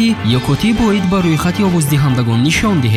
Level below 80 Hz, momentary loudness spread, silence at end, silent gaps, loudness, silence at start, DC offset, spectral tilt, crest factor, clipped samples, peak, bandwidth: -32 dBFS; 2 LU; 0 s; none; -13 LUFS; 0 s; 0.3%; -5.5 dB/octave; 12 dB; under 0.1%; -2 dBFS; 15 kHz